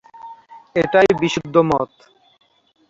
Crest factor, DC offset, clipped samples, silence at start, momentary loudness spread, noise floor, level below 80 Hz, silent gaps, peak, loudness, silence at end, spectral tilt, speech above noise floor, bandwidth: 18 dB; under 0.1%; under 0.1%; 0.15 s; 24 LU; -41 dBFS; -52 dBFS; none; -2 dBFS; -17 LUFS; 1.05 s; -5.5 dB/octave; 24 dB; 7.8 kHz